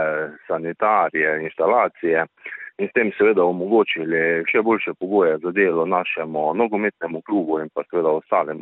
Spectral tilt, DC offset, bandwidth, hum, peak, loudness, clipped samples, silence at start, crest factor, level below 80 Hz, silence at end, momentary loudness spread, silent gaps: -10 dB/octave; under 0.1%; 4 kHz; none; -4 dBFS; -20 LUFS; under 0.1%; 0 s; 16 dB; -68 dBFS; 0 s; 8 LU; none